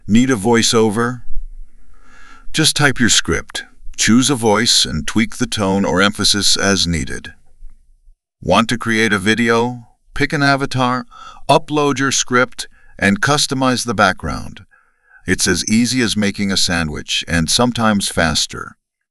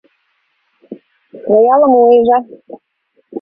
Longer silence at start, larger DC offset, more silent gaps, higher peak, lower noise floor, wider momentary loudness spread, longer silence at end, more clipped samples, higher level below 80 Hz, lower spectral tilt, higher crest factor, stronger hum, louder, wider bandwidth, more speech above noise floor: second, 0.05 s vs 0.9 s; neither; neither; about the same, 0 dBFS vs 0 dBFS; second, -52 dBFS vs -63 dBFS; second, 15 LU vs 21 LU; first, 0.35 s vs 0 s; neither; first, -36 dBFS vs -58 dBFS; second, -3.5 dB/octave vs -10 dB/octave; about the same, 16 dB vs 14 dB; neither; second, -15 LUFS vs -10 LUFS; first, 13.5 kHz vs 3.9 kHz; second, 36 dB vs 54 dB